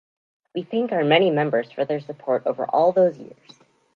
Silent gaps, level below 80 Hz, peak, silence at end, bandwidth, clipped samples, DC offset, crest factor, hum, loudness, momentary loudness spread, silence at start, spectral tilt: none; -76 dBFS; -4 dBFS; 0.7 s; 6.8 kHz; under 0.1%; under 0.1%; 20 dB; none; -21 LUFS; 11 LU; 0.55 s; -7.5 dB/octave